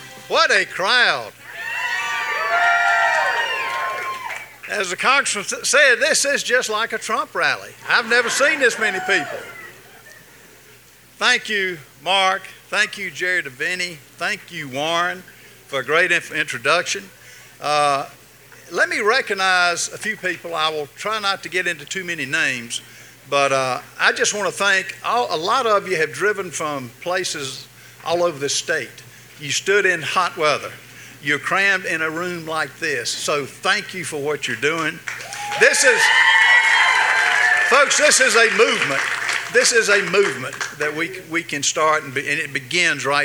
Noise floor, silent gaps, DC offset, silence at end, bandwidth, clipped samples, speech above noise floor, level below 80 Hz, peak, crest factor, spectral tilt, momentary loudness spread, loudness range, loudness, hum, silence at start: -48 dBFS; none; under 0.1%; 0 s; over 20 kHz; under 0.1%; 28 dB; -66 dBFS; 0 dBFS; 20 dB; -1.5 dB/octave; 13 LU; 8 LU; -18 LUFS; none; 0 s